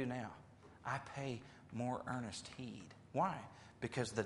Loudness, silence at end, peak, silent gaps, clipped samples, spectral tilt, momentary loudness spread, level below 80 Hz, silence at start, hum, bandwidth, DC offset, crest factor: -44 LUFS; 0 s; -22 dBFS; none; under 0.1%; -5.5 dB/octave; 13 LU; -72 dBFS; 0 s; none; 11.5 kHz; under 0.1%; 22 dB